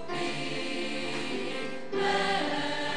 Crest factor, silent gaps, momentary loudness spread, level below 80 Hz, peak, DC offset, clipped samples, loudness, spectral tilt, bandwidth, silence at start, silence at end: 16 dB; none; 7 LU; -68 dBFS; -16 dBFS; 1%; under 0.1%; -31 LUFS; -3.5 dB/octave; 10 kHz; 0 s; 0 s